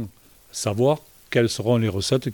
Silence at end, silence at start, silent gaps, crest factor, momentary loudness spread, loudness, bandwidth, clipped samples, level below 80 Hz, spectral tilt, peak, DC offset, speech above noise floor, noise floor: 0 s; 0 s; none; 16 dB; 9 LU; -23 LUFS; 19 kHz; under 0.1%; -56 dBFS; -5.5 dB/octave; -6 dBFS; under 0.1%; 23 dB; -44 dBFS